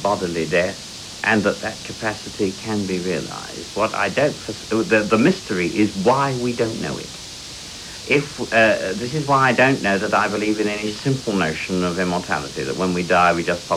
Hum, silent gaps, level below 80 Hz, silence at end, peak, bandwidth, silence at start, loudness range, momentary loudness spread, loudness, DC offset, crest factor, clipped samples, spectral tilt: none; none; -50 dBFS; 0 s; -2 dBFS; 15.5 kHz; 0 s; 4 LU; 13 LU; -20 LUFS; under 0.1%; 18 dB; under 0.1%; -4.5 dB/octave